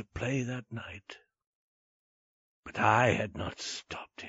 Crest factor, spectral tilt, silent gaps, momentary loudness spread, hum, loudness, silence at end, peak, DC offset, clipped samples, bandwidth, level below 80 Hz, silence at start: 24 dB; -4 dB/octave; 1.47-2.63 s; 20 LU; none; -31 LUFS; 0 s; -10 dBFS; under 0.1%; under 0.1%; 8 kHz; -60 dBFS; 0 s